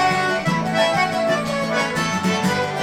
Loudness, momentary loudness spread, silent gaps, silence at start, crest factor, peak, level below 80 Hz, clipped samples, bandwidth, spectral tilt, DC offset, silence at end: -20 LUFS; 3 LU; none; 0 s; 14 dB; -6 dBFS; -52 dBFS; under 0.1%; 16.5 kHz; -4.5 dB/octave; under 0.1%; 0 s